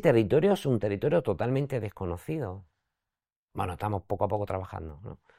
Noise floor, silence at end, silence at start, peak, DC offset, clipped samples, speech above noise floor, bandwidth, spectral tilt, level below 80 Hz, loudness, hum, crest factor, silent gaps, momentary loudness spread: under -90 dBFS; 0.25 s; 0 s; -8 dBFS; under 0.1%; under 0.1%; over 62 dB; 16 kHz; -8 dB/octave; -56 dBFS; -29 LUFS; none; 20 dB; 3.36-3.48 s; 16 LU